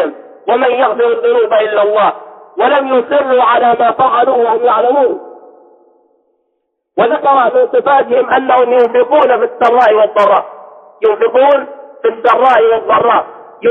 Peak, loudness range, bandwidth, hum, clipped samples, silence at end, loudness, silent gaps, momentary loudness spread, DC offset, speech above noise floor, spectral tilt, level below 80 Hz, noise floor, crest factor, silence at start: 0 dBFS; 4 LU; 5.2 kHz; none; under 0.1%; 0 s; -10 LUFS; none; 7 LU; under 0.1%; 57 dB; -6 dB/octave; -60 dBFS; -67 dBFS; 10 dB; 0 s